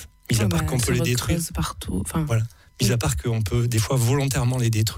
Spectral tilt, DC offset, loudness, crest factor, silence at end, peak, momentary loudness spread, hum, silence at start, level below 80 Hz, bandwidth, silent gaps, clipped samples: -5 dB/octave; under 0.1%; -23 LUFS; 14 dB; 0 s; -10 dBFS; 6 LU; none; 0 s; -36 dBFS; 16.5 kHz; none; under 0.1%